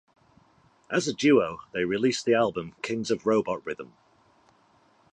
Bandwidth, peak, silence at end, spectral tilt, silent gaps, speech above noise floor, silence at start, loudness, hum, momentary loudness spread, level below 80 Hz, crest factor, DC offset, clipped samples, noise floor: 10.5 kHz; -8 dBFS; 1.25 s; -4.5 dB/octave; none; 37 dB; 0.9 s; -26 LUFS; none; 12 LU; -64 dBFS; 20 dB; under 0.1%; under 0.1%; -62 dBFS